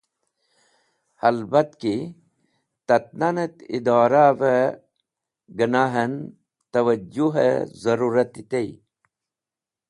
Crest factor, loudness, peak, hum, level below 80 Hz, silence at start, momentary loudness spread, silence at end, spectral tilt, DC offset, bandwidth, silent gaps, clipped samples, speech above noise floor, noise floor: 20 dB; -21 LUFS; -4 dBFS; none; -66 dBFS; 1.25 s; 13 LU; 1.15 s; -7 dB/octave; under 0.1%; 11.5 kHz; none; under 0.1%; 69 dB; -89 dBFS